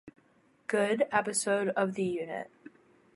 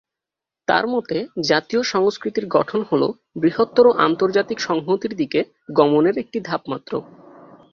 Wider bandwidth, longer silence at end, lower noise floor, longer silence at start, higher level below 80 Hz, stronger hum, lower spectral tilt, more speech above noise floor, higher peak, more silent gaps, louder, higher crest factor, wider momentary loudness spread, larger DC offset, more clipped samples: first, 11.5 kHz vs 7.2 kHz; about the same, 0.7 s vs 0.7 s; second, -66 dBFS vs -87 dBFS; second, 0.05 s vs 0.7 s; second, -76 dBFS vs -62 dBFS; neither; second, -4 dB/octave vs -5.5 dB/octave; second, 36 dB vs 68 dB; second, -12 dBFS vs -2 dBFS; neither; second, -30 LUFS vs -20 LUFS; about the same, 20 dB vs 18 dB; about the same, 13 LU vs 11 LU; neither; neither